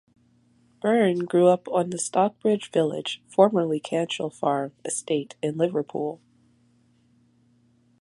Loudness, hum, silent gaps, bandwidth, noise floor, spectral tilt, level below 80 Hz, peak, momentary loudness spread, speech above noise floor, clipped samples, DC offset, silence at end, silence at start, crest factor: -24 LUFS; none; none; 11.5 kHz; -62 dBFS; -5 dB/octave; -74 dBFS; -4 dBFS; 10 LU; 39 dB; under 0.1%; under 0.1%; 1.85 s; 0.85 s; 22 dB